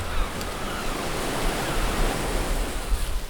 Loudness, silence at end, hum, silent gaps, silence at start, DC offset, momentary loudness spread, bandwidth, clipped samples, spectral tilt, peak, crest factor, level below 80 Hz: -28 LUFS; 0 s; none; none; 0 s; under 0.1%; 4 LU; over 20 kHz; under 0.1%; -4 dB/octave; -12 dBFS; 14 dB; -28 dBFS